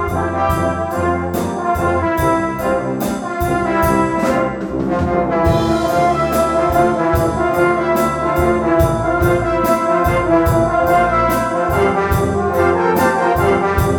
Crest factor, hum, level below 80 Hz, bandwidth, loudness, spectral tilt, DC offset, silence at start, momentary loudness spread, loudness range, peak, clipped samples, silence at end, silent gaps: 14 dB; none; -32 dBFS; over 20 kHz; -16 LUFS; -6.5 dB/octave; under 0.1%; 0 s; 5 LU; 3 LU; 0 dBFS; under 0.1%; 0 s; none